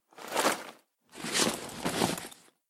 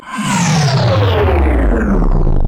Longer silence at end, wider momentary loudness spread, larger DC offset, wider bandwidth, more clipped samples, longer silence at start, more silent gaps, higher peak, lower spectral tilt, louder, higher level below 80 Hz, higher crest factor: first, 0.35 s vs 0 s; first, 13 LU vs 3 LU; neither; first, 17 kHz vs 13 kHz; neither; first, 0.15 s vs 0 s; neither; second, -12 dBFS vs -4 dBFS; second, -2.5 dB/octave vs -5.5 dB/octave; second, -31 LUFS vs -13 LUFS; second, -64 dBFS vs -16 dBFS; first, 22 dB vs 6 dB